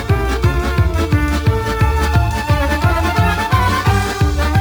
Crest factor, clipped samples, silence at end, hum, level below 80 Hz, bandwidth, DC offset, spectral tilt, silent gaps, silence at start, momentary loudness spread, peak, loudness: 12 dB; under 0.1%; 0 s; none; -20 dBFS; over 20 kHz; under 0.1%; -6 dB/octave; none; 0 s; 2 LU; -2 dBFS; -16 LUFS